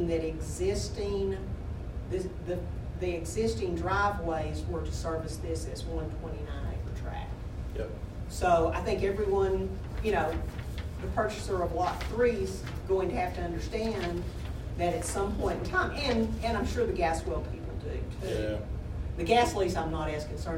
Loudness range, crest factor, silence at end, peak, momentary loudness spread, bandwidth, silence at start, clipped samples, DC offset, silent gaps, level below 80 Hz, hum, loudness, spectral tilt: 4 LU; 20 dB; 0 s; -12 dBFS; 10 LU; 16 kHz; 0 s; under 0.1%; under 0.1%; none; -40 dBFS; none; -32 LUFS; -6 dB/octave